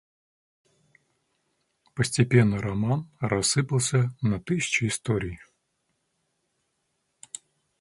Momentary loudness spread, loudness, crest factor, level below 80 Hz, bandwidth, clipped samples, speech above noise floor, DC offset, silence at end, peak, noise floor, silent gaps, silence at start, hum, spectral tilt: 20 LU; -25 LUFS; 22 dB; -54 dBFS; 11.5 kHz; under 0.1%; 51 dB; under 0.1%; 2.4 s; -6 dBFS; -76 dBFS; none; 1.95 s; none; -5 dB/octave